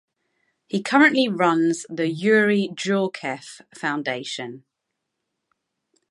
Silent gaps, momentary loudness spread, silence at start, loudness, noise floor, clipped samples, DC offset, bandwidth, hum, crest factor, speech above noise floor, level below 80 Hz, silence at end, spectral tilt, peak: none; 14 LU; 0.75 s; -21 LUFS; -80 dBFS; under 0.1%; under 0.1%; 11.5 kHz; none; 22 dB; 59 dB; -76 dBFS; 1.5 s; -5 dB/octave; -2 dBFS